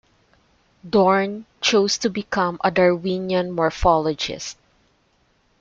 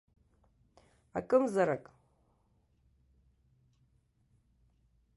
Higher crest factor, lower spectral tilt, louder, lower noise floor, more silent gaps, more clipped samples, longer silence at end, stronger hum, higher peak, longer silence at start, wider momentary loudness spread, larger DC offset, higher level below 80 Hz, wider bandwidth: second, 18 dB vs 24 dB; second, -4.5 dB/octave vs -7 dB/octave; first, -20 LUFS vs -32 LUFS; second, -63 dBFS vs -72 dBFS; neither; neither; second, 1.1 s vs 3.35 s; neither; first, -4 dBFS vs -14 dBFS; second, 0.85 s vs 1.15 s; second, 9 LU vs 13 LU; neither; first, -40 dBFS vs -72 dBFS; second, 7.8 kHz vs 11.5 kHz